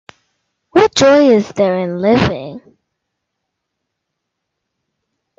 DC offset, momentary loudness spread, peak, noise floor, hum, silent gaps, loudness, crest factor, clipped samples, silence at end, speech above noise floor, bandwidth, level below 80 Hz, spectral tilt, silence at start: under 0.1%; 9 LU; 0 dBFS; -76 dBFS; none; none; -12 LUFS; 16 dB; under 0.1%; 2.8 s; 64 dB; 8 kHz; -48 dBFS; -5 dB/octave; 0.75 s